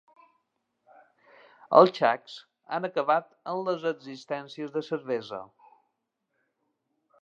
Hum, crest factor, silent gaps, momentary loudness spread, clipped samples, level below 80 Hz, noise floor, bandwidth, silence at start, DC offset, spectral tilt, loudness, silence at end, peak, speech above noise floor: none; 26 dB; none; 20 LU; under 0.1%; -84 dBFS; -80 dBFS; 7.8 kHz; 1.7 s; under 0.1%; -6 dB/octave; -27 LUFS; 1.75 s; -2 dBFS; 54 dB